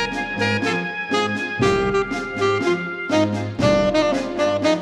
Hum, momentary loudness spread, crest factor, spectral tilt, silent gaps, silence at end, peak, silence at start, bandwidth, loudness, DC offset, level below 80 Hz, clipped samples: none; 5 LU; 18 dB; -5.5 dB/octave; none; 0 s; -4 dBFS; 0 s; 12 kHz; -20 LUFS; under 0.1%; -44 dBFS; under 0.1%